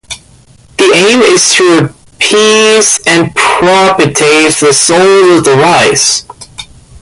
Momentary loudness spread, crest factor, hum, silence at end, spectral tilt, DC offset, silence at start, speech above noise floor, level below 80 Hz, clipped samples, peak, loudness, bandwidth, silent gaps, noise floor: 16 LU; 8 dB; none; 0.05 s; -2.5 dB/octave; under 0.1%; 0.1 s; 33 dB; -44 dBFS; 0.1%; 0 dBFS; -6 LUFS; 11.5 kHz; none; -39 dBFS